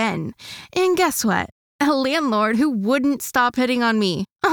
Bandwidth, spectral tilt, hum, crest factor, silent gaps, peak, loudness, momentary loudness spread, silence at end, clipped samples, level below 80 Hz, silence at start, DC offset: over 20 kHz; -4 dB/octave; none; 16 dB; 1.52-1.79 s, 4.32-4.36 s; -4 dBFS; -20 LUFS; 8 LU; 0 s; under 0.1%; -56 dBFS; 0 s; under 0.1%